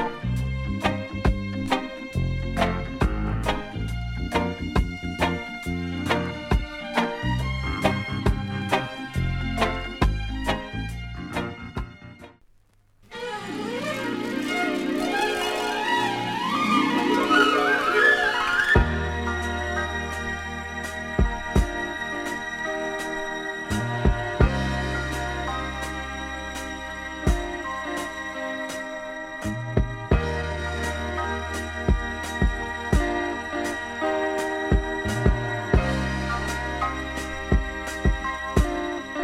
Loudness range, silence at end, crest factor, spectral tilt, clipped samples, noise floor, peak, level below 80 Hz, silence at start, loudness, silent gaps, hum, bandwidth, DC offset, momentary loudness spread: 9 LU; 0 s; 20 dB; -5.5 dB/octave; under 0.1%; -59 dBFS; -4 dBFS; -32 dBFS; 0 s; -26 LUFS; none; none; 15.5 kHz; under 0.1%; 10 LU